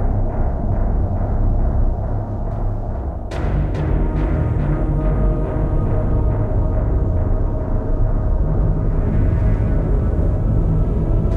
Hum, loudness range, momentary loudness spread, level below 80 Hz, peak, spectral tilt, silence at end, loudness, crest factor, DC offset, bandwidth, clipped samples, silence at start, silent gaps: none; 3 LU; 5 LU; -18 dBFS; -6 dBFS; -10.5 dB/octave; 0 s; -20 LUFS; 10 dB; under 0.1%; 3.8 kHz; under 0.1%; 0 s; none